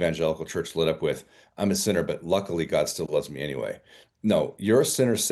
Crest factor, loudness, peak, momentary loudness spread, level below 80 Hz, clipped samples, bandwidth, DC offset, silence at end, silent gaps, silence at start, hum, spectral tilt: 16 dB; -26 LUFS; -8 dBFS; 9 LU; -58 dBFS; under 0.1%; 13 kHz; under 0.1%; 0 s; none; 0 s; none; -4.5 dB/octave